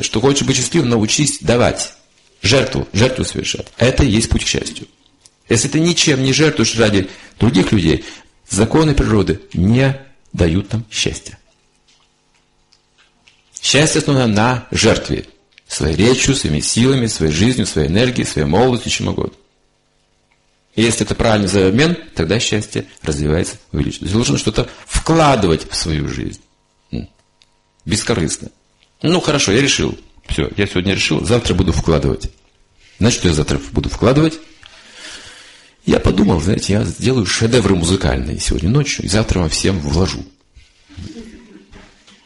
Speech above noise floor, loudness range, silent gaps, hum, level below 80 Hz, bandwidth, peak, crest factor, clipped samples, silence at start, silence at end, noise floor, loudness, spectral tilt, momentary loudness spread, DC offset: 44 dB; 4 LU; none; none; -30 dBFS; 11.5 kHz; 0 dBFS; 16 dB; under 0.1%; 0 s; 0.45 s; -59 dBFS; -15 LUFS; -4.5 dB/octave; 12 LU; under 0.1%